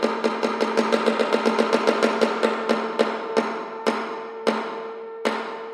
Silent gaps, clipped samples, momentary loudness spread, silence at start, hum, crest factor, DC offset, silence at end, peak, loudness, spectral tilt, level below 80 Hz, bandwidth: none; under 0.1%; 8 LU; 0 s; none; 20 dB; under 0.1%; 0 s; -4 dBFS; -23 LUFS; -4 dB/octave; -80 dBFS; 13 kHz